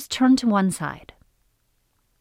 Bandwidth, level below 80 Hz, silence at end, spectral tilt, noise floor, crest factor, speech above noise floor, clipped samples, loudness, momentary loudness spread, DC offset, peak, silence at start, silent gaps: 15.5 kHz; -56 dBFS; 1.2 s; -5 dB/octave; -68 dBFS; 16 dB; 47 dB; under 0.1%; -21 LUFS; 15 LU; under 0.1%; -8 dBFS; 0 s; none